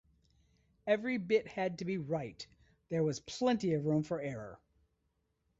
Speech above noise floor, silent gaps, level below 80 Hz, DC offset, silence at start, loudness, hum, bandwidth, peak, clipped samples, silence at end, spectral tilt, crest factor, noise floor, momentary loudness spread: 46 dB; none; -70 dBFS; under 0.1%; 0.85 s; -35 LUFS; none; 8 kHz; -18 dBFS; under 0.1%; 1.05 s; -6.5 dB/octave; 20 dB; -80 dBFS; 14 LU